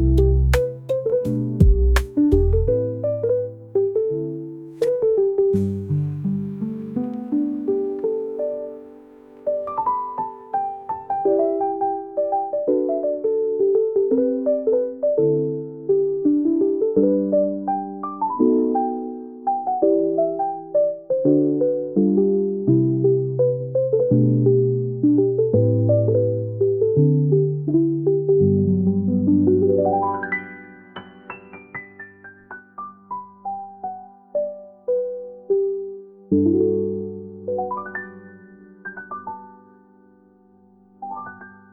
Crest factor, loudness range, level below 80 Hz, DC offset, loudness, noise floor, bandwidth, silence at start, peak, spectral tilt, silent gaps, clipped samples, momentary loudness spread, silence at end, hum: 16 dB; 12 LU; -32 dBFS; under 0.1%; -21 LUFS; -53 dBFS; 12 kHz; 0 s; -4 dBFS; -9.5 dB/octave; none; under 0.1%; 17 LU; 0.2 s; none